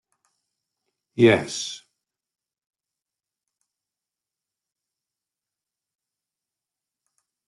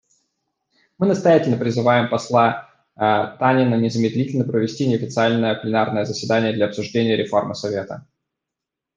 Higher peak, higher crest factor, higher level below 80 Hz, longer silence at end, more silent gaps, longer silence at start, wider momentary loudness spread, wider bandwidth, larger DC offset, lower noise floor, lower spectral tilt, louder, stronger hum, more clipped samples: about the same, -4 dBFS vs -2 dBFS; first, 26 dB vs 18 dB; second, -70 dBFS vs -64 dBFS; first, 5.7 s vs 0.95 s; neither; first, 1.15 s vs 1 s; first, 20 LU vs 7 LU; first, 11.5 kHz vs 9.4 kHz; neither; first, -89 dBFS vs -84 dBFS; second, -5 dB/octave vs -6.5 dB/octave; about the same, -20 LUFS vs -19 LUFS; neither; neither